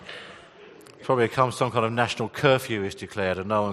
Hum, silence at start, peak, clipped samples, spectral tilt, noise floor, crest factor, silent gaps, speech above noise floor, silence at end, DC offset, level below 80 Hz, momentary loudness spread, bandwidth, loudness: none; 0 s; -4 dBFS; under 0.1%; -5.5 dB/octave; -48 dBFS; 22 dB; none; 24 dB; 0 s; under 0.1%; -62 dBFS; 17 LU; 13 kHz; -25 LUFS